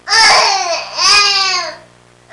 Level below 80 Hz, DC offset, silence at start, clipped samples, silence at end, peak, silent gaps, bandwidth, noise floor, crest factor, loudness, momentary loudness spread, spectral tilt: -50 dBFS; under 0.1%; 0.05 s; under 0.1%; 0.55 s; 0 dBFS; none; 11.5 kHz; -44 dBFS; 12 dB; -9 LUFS; 11 LU; 1.5 dB/octave